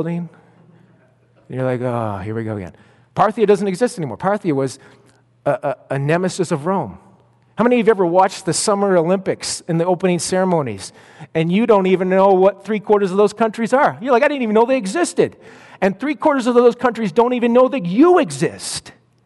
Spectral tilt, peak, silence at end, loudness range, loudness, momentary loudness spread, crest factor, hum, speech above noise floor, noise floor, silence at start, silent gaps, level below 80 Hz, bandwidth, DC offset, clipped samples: -5.5 dB/octave; -2 dBFS; 0.35 s; 5 LU; -17 LUFS; 11 LU; 16 dB; none; 37 dB; -54 dBFS; 0 s; none; -60 dBFS; 11.5 kHz; under 0.1%; under 0.1%